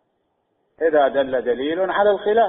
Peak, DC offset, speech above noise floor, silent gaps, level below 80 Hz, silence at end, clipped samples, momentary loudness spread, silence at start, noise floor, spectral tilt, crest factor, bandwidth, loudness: -6 dBFS; under 0.1%; 52 dB; none; -58 dBFS; 0 s; under 0.1%; 5 LU; 0.8 s; -70 dBFS; -9.5 dB/octave; 14 dB; 4 kHz; -19 LUFS